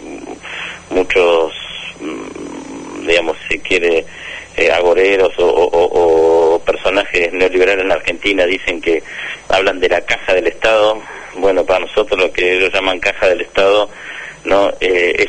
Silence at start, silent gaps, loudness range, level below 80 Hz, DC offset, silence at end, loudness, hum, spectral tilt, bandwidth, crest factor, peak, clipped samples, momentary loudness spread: 0 s; none; 5 LU; -40 dBFS; under 0.1%; 0 s; -14 LUFS; none; -3.5 dB/octave; 9.6 kHz; 14 dB; 0 dBFS; under 0.1%; 14 LU